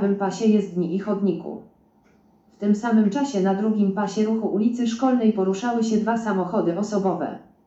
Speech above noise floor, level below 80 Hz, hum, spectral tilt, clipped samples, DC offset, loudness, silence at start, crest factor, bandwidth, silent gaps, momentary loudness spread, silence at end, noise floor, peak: 37 dB; -66 dBFS; none; -7 dB/octave; under 0.1%; under 0.1%; -22 LUFS; 0 s; 14 dB; 8 kHz; none; 6 LU; 0.25 s; -58 dBFS; -8 dBFS